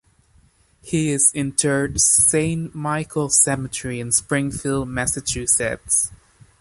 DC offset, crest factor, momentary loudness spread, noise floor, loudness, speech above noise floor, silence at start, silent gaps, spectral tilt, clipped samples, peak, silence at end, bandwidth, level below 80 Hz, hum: under 0.1%; 20 dB; 11 LU; -56 dBFS; -19 LUFS; 36 dB; 0.85 s; none; -3.5 dB/octave; under 0.1%; -2 dBFS; 0.45 s; 12 kHz; -44 dBFS; none